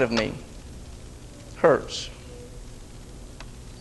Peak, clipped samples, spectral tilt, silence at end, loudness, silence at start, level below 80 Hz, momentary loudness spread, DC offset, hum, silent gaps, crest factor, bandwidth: -4 dBFS; under 0.1%; -4.5 dB/octave; 0 s; -25 LUFS; 0 s; -44 dBFS; 23 LU; under 0.1%; none; none; 26 dB; 12 kHz